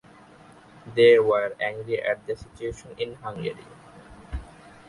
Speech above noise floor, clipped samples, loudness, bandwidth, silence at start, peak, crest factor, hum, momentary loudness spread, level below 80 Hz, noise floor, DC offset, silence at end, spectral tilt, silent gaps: 27 dB; under 0.1%; -24 LUFS; 11 kHz; 0.85 s; -6 dBFS; 20 dB; none; 22 LU; -48 dBFS; -51 dBFS; under 0.1%; 0.45 s; -5.5 dB/octave; none